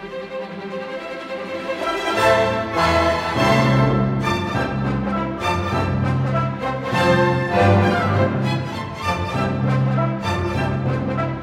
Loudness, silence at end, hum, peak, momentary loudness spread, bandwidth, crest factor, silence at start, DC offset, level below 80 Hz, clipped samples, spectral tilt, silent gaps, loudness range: -20 LUFS; 0 s; none; -2 dBFS; 13 LU; 14 kHz; 16 dB; 0 s; under 0.1%; -40 dBFS; under 0.1%; -6.5 dB/octave; none; 3 LU